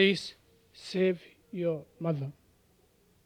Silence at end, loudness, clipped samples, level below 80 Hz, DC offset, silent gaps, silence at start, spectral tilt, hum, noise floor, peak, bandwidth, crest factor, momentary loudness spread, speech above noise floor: 0.95 s; -33 LUFS; under 0.1%; -72 dBFS; under 0.1%; none; 0 s; -6 dB/octave; none; -66 dBFS; -8 dBFS; 12 kHz; 24 dB; 14 LU; 37 dB